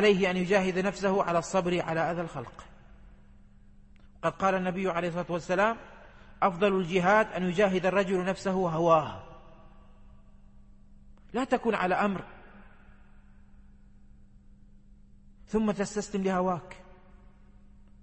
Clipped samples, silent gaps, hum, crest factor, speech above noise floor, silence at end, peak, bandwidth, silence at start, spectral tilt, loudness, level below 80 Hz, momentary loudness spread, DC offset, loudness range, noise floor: under 0.1%; none; none; 20 dB; 26 dB; 0.35 s; -10 dBFS; 8.8 kHz; 0 s; -6 dB/octave; -28 LUFS; -54 dBFS; 13 LU; under 0.1%; 7 LU; -54 dBFS